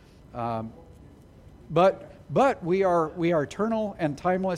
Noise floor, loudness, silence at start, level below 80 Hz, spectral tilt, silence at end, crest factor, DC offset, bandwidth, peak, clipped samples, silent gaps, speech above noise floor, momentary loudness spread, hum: -50 dBFS; -26 LUFS; 0.35 s; -54 dBFS; -7 dB/octave; 0 s; 18 dB; under 0.1%; 11.5 kHz; -8 dBFS; under 0.1%; none; 25 dB; 12 LU; none